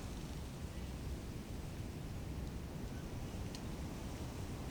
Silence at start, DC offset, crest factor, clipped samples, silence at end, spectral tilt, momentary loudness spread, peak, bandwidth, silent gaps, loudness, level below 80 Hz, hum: 0 s; under 0.1%; 14 dB; under 0.1%; 0 s; -6 dB/octave; 1 LU; -32 dBFS; over 20 kHz; none; -46 LUFS; -50 dBFS; none